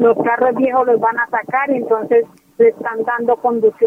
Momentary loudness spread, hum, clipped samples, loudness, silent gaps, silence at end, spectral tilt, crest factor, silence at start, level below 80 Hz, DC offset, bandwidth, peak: 5 LU; none; under 0.1%; -16 LUFS; none; 0 s; -8 dB/octave; 14 dB; 0 s; -62 dBFS; under 0.1%; 3.4 kHz; -2 dBFS